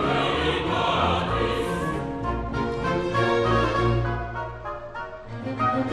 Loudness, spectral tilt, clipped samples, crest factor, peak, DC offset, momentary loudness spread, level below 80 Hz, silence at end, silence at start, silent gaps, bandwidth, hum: -25 LUFS; -6.5 dB/octave; under 0.1%; 16 dB; -10 dBFS; under 0.1%; 12 LU; -38 dBFS; 0 s; 0 s; none; 12.5 kHz; none